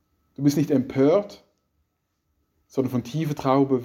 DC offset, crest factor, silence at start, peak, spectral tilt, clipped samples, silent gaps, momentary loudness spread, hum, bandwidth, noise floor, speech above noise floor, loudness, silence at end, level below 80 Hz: under 0.1%; 18 dB; 0.4 s; -6 dBFS; -7.5 dB/octave; under 0.1%; none; 8 LU; none; 16 kHz; -74 dBFS; 52 dB; -23 LUFS; 0 s; -62 dBFS